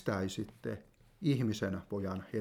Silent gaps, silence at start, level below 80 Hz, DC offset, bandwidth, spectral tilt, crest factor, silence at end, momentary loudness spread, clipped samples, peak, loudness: none; 0 s; -66 dBFS; under 0.1%; 17 kHz; -6.5 dB/octave; 18 dB; 0 s; 11 LU; under 0.1%; -18 dBFS; -37 LUFS